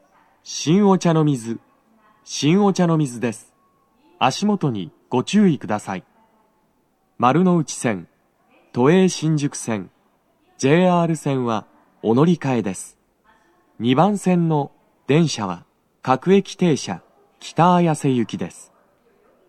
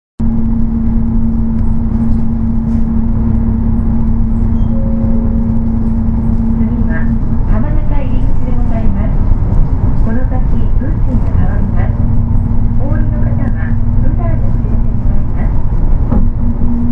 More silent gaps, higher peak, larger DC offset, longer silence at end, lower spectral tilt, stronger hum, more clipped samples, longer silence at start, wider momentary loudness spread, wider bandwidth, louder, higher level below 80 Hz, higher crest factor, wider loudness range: neither; about the same, -2 dBFS vs 0 dBFS; neither; first, 0.85 s vs 0 s; second, -6 dB/octave vs -11.5 dB/octave; neither; neither; first, 0.45 s vs 0.2 s; first, 15 LU vs 2 LU; first, 12.5 kHz vs 2.4 kHz; second, -19 LUFS vs -15 LUFS; second, -70 dBFS vs -12 dBFS; first, 20 dB vs 10 dB; about the same, 3 LU vs 1 LU